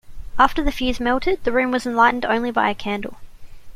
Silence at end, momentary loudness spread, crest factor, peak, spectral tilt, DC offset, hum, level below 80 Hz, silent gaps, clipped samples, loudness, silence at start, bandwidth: 0 s; 10 LU; 18 dB; -2 dBFS; -5 dB/octave; under 0.1%; none; -34 dBFS; none; under 0.1%; -20 LUFS; 0.05 s; 15 kHz